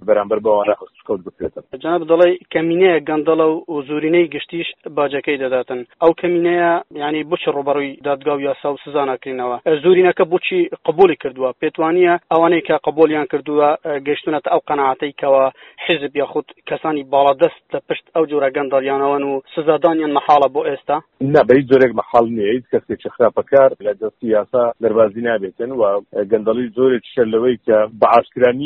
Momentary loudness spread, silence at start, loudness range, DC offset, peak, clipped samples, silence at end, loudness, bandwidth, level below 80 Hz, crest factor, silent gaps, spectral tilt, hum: 10 LU; 0 s; 3 LU; under 0.1%; 0 dBFS; under 0.1%; 0 s; -16 LUFS; 4.5 kHz; -58 dBFS; 16 dB; none; -4 dB/octave; none